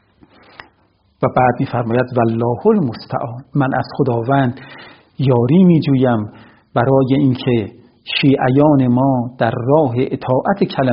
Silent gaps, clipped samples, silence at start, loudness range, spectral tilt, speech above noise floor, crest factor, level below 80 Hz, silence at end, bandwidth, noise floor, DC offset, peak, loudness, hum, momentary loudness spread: none; under 0.1%; 1.2 s; 3 LU; -6.5 dB/octave; 43 dB; 16 dB; -50 dBFS; 0 s; 5.6 kHz; -57 dBFS; under 0.1%; 0 dBFS; -15 LUFS; none; 9 LU